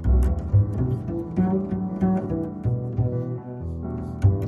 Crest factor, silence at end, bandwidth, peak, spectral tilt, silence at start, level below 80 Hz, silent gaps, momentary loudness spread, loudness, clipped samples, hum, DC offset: 16 dB; 0 s; 6.8 kHz; -6 dBFS; -11 dB/octave; 0 s; -30 dBFS; none; 9 LU; -25 LUFS; under 0.1%; none; under 0.1%